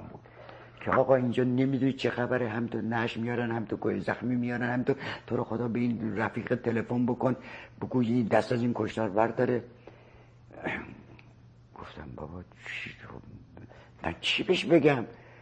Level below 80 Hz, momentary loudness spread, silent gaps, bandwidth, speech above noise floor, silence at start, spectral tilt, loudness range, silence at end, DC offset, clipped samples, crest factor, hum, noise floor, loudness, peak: -60 dBFS; 20 LU; none; 9.2 kHz; 26 dB; 0 s; -7 dB/octave; 12 LU; 0 s; under 0.1%; under 0.1%; 20 dB; none; -55 dBFS; -29 LUFS; -10 dBFS